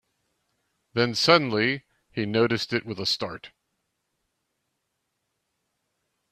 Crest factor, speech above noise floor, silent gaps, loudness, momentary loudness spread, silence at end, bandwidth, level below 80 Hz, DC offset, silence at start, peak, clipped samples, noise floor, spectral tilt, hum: 26 dB; 55 dB; none; -24 LUFS; 15 LU; 2.85 s; 14 kHz; -66 dBFS; under 0.1%; 0.95 s; -2 dBFS; under 0.1%; -79 dBFS; -4.5 dB/octave; none